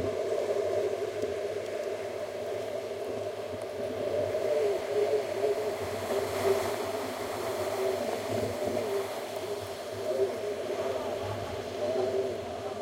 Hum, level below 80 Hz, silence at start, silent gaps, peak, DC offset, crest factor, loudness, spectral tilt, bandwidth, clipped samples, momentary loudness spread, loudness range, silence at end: none; -64 dBFS; 0 s; none; -16 dBFS; under 0.1%; 16 dB; -32 LUFS; -4.5 dB/octave; 16 kHz; under 0.1%; 7 LU; 3 LU; 0 s